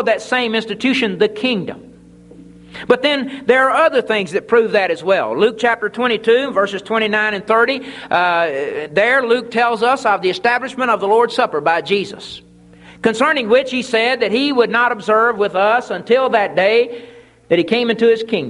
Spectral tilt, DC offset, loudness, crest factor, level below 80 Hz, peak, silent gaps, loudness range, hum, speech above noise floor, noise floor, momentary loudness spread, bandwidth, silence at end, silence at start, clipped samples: -4.5 dB/octave; under 0.1%; -15 LUFS; 16 dB; -58 dBFS; 0 dBFS; none; 2 LU; none; 27 dB; -42 dBFS; 6 LU; 11.5 kHz; 0 s; 0 s; under 0.1%